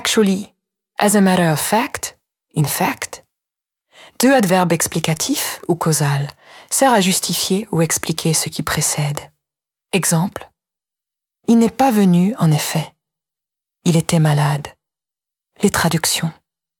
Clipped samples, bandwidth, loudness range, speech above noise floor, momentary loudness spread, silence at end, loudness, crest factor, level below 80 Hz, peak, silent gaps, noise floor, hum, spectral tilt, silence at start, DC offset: under 0.1%; 18 kHz; 3 LU; 71 dB; 13 LU; 0.45 s; -17 LUFS; 18 dB; -52 dBFS; 0 dBFS; none; -88 dBFS; none; -4.5 dB/octave; 0 s; under 0.1%